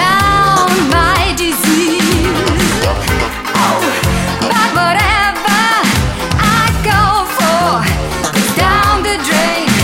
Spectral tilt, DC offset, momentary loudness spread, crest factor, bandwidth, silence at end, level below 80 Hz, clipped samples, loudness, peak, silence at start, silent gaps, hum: -4 dB/octave; under 0.1%; 4 LU; 12 dB; 17 kHz; 0 s; -24 dBFS; under 0.1%; -11 LUFS; 0 dBFS; 0 s; none; none